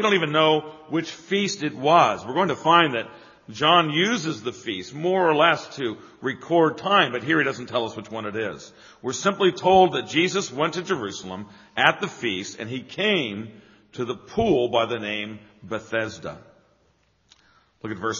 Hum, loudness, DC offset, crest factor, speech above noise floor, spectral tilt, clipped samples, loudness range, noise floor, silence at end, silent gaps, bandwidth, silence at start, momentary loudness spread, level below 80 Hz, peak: none; -22 LUFS; under 0.1%; 22 dB; 41 dB; -2.5 dB/octave; under 0.1%; 6 LU; -64 dBFS; 0 s; none; 7.4 kHz; 0 s; 16 LU; -60 dBFS; 0 dBFS